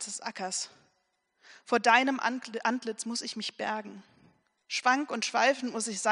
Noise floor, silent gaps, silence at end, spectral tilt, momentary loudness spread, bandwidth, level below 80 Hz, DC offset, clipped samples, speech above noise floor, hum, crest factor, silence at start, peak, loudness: -76 dBFS; none; 0 s; -1.5 dB/octave; 12 LU; 10.5 kHz; -86 dBFS; under 0.1%; under 0.1%; 46 dB; none; 24 dB; 0 s; -8 dBFS; -29 LUFS